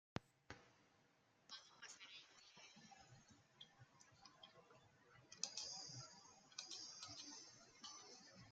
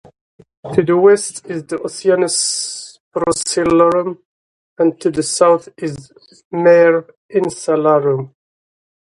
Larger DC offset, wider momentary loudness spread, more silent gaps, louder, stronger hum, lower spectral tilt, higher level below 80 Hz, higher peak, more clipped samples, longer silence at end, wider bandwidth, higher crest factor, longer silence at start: neither; about the same, 16 LU vs 15 LU; second, none vs 3.00-3.11 s, 4.25-4.76 s, 6.45-6.51 s, 7.17-7.29 s; second, -56 LUFS vs -15 LUFS; neither; second, -1.5 dB/octave vs -4 dB/octave; second, -86 dBFS vs -54 dBFS; second, -24 dBFS vs 0 dBFS; neither; second, 0 s vs 0.8 s; second, 9.6 kHz vs 11.5 kHz; first, 36 dB vs 16 dB; second, 0.15 s vs 0.65 s